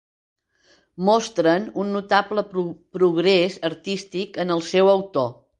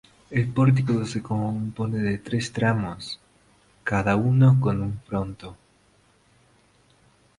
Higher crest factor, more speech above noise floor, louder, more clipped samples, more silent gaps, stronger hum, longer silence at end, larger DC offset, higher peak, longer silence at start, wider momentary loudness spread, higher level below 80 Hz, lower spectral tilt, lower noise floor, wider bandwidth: about the same, 18 dB vs 18 dB; about the same, 40 dB vs 38 dB; first, -21 LUFS vs -24 LUFS; neither; neither; neither; second, 0.25 s vs 1.85 s; neither; about the same, -4 dBFS vs -6 dBFS; first, 1 s vs 0.3 s; second, 10 LU vs 16 LU; second, -66 dBFS vs -50 dBFS; second, -5.5 dB/octave vs -7.5 dB/octave; about the same, -60 dBFS vs -61 dBFS; second, 9.6 kHz vs 11 kHz